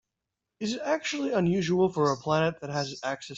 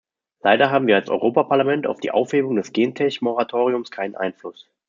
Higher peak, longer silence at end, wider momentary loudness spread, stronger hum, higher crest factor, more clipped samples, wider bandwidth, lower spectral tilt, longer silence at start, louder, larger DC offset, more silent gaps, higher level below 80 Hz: second, -12 dBFS vs -2 dBFS; second, 0 s vs 0.35 s; second, 8 LU vs 11 LU; neither; about the same, 16 dB vs 18 dB; neither; about the same, 8 kHz vs 7.6 kHz; about the same, -5.5 dB/octave vs -6 dB/octave; first, 0.6 s vs 0.45 s; second, -28 LUFS vs -20 LUFS; neither; neither; first, -64 dBFS vs -70 dBFS